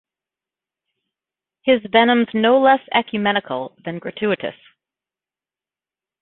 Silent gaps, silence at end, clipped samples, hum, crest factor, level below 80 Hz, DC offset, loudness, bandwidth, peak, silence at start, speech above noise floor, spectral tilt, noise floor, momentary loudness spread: none; 1.7 s; under 0.1%; none; 20 dB; -64 dBFS; under 0.1%; -18 LUFS; 4.2 kHz; -2 dBFS; 1.65 s; over 72 dB; -9.5 dB/octave; under -90 dBFS; 14 LU